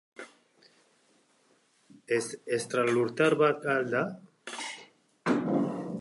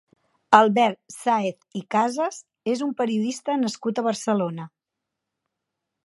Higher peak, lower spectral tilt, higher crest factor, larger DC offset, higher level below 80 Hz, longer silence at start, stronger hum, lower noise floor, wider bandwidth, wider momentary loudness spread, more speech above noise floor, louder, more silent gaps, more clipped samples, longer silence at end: second, -10 dBFS vs 0 dBFS; about the same, -5 dB/octave vs -5 dB/octave; about the same, 20 dB vs 24 dB; neither; about the same, -80 dBFS vs -76 dBFS; second, 0.2 s vs 0.5 s; neither; second, -67 dBFS vs -84 dBFS; about the same, 11.5 kHz vs 11.5 kHz; first, 20 LU vs 13 LU; second, 39 dB vs 61 dB; second, -29 LUFS vs -23 LUFS; neither; neither; second, 0 s vs 1.4 s